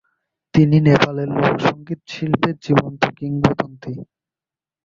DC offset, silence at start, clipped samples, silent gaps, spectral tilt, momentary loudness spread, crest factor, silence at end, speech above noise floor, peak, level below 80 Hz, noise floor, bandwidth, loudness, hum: under 0.1%; 0.55 s; under 0.1%; none; -7.5 dB/octave; 16 LU; 18 dB; 0.8 s; over 72 dB; 0 dBFS; -48 dBFS; under -90 dBFS; 7.4 kHz; -18 LUFS; none